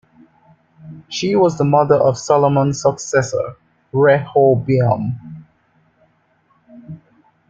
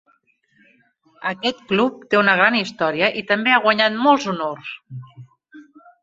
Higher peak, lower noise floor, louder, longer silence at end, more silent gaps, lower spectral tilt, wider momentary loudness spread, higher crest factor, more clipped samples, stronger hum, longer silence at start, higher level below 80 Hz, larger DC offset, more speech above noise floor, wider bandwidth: about the same, -2 dBFS vs 0 dBFS; about the same, -59 dBFS vs -62 dBFS; about the same, -16 LUFS vs -18 LUFS; first, 0.55 s vs 0.4 s; neither; about the same, -6 dB/octave vs -5 dB/octave; about the same, 16 LU vs 18 LU; about the same, 16 dB vs 20 dB; neither; neither; second, 0.85 s vs 1.2 s; first, -54 dBFS vs -66 dBFS; neither; about the same, 44 dB vs 43 dB; about the same, 7.8 kHz vs 7.8 kHz